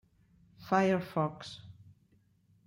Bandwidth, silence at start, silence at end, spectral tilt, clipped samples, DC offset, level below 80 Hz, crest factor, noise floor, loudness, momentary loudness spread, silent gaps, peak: 16 kHz; 0.6 s; 0.95 s; -6.5 dB/octave; under 0.1%; under 0.1%; -72 dBFS; 20 dB; -69 dBFS; -31 LUFS; 21 LU; none; -14 dBFS